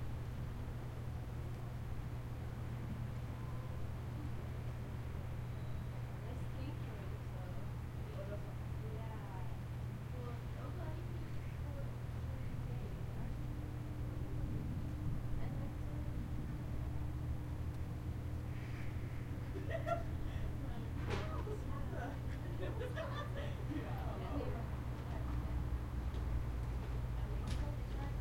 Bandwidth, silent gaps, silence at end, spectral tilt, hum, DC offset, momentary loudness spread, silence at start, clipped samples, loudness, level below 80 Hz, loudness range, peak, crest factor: 16.5 kHz; none; 0 s; -7.5 dB/octave; none; under 0.1%; 4 LU; 0 s; under 0.1%; -44 LUFS; -48 dBFS; 3 LU; -26 dBFS; 16 dB